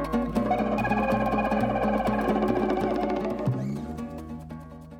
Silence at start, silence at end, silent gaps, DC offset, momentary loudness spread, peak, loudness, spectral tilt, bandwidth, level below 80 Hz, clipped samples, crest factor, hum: 0 s; 0 s; none; under 0.1%; 13 LU; -12 dBFS; -26 LUFS; -7.5 dB/octave; 16.5 kHz; -42 dBFS; under 0.1%; 16 dB; none